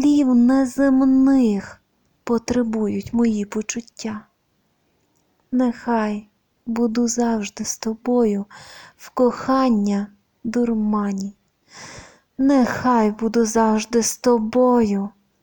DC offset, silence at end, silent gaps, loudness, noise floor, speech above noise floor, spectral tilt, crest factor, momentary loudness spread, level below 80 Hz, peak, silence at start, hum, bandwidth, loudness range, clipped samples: under 0.1%; 0.35 s; none; -20 LUFS; -67 dBFS; 48 dB; -5 dB/octave; 14 dB; 17 LU; -50 dBFS; -6 dBFS; 0 s; none; 19 kHz; 6 LU; under 0.1%